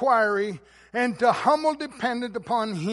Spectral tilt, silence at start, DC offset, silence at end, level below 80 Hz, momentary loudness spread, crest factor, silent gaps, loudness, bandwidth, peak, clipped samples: -5.5 dB/octave; 0 s; under 0.1%; 0 s; -64 dBFS; 10 LU; 18 dB; none; -25 LUFS; 11.5 kHz; -8 dBFS; under 0.1%